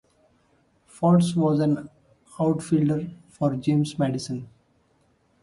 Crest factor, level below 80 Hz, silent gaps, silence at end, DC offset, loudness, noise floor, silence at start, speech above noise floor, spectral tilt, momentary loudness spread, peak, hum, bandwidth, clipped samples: 18 dB; -60 dBFS; none; 0.95 s; under 0.1%; -24 LUFS; -65 dBFS; 0.95 s; 42 dB; -7.5 dB/octave; 13 LU; -8 dBFS; none; 11.5 kHz; under 0.1%